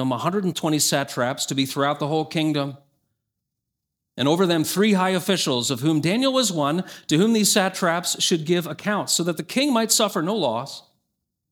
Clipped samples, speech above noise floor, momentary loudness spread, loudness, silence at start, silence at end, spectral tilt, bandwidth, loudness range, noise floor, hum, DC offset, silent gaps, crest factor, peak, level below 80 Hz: under 0.1%; 60 dB; 7 LU; -21 LUFS; 0 s; 0.7 s; -3.5 dB/octave; over 20 kHz; 4 LU; -82 dBFS; none; under 0.1%; none; 18 dB; -4 dBFS; -70 dBFS